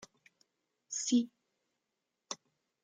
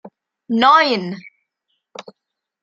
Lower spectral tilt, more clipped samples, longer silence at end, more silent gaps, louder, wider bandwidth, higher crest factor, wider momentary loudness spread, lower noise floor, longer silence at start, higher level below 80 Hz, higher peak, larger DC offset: second, -2.5 dB/octave vs -5 dB/octave; neither; about the same, 0.5 s vs 0.6 s; neither; second, -36 LUFS vs -15 LUFS; first, 9.6 kHz vs 7.8 kHz; about the same, 20 dB vs 18 dB; second, 15 LU vs 26 LU; first, -87 dBFS vs -80 dBFS; about the same, 0 s vs 0.05 s; second, -88 dBFS vs -70 dBFS; second, -20 dBFS vs -2 dBFS; neither